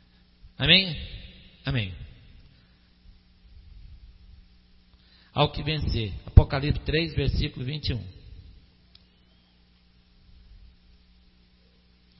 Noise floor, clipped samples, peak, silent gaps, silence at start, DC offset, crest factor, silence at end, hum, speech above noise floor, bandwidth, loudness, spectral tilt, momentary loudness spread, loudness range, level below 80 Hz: -60 dBFS; under 0.1%; 0 dBFS; none; 0.45 s; under 0.1%; 28 dB; 3.7 s; 60 Hz at -55 dBFS; 36 dB; 5.8 kHz; -25 LUFS; -9.5 dB/octave; 26 LU; 13 LU; -36 dBFS